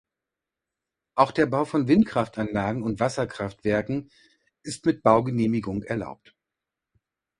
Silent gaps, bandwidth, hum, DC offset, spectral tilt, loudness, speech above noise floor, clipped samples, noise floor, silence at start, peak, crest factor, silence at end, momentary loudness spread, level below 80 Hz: none; 11.5 kHz; none; under 0.1%; -7 dB/octave; -25 LUFS; 63 dB; under 0.1%; -87 dBFS; 1.15 s; -2 dBFS; 22 dB; 1.25 s; 11 LU; -54 dBFS